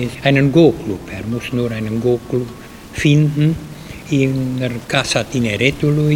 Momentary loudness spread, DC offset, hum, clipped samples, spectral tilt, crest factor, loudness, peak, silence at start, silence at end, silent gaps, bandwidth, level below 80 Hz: 13 LU; under 0.1%; none; under 0.1%; -6 dB/octave; 16 dB; -17 LUFS; 0 dBFS; 0 s; 0 s; none; 16 kHz; -40 dBFS